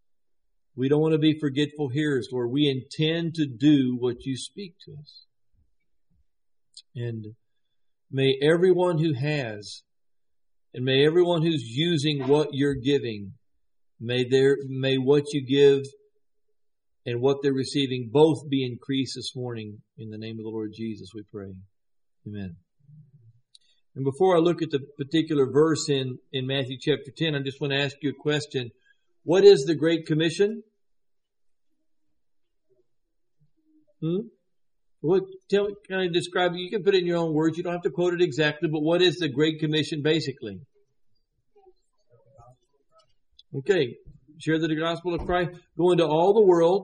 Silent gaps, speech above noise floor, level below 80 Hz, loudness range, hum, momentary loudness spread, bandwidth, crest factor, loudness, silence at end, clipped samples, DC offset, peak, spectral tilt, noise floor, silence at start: none; 62 dB; -60 dBFS; 14 LU; none; 18 LU; 10 kHz; 22 dB; -24 LUFS; 0 s; under 0.1%; under 0.1%; -4 dBFS; -6 dB/octave; -86 dBFS; 0.75 s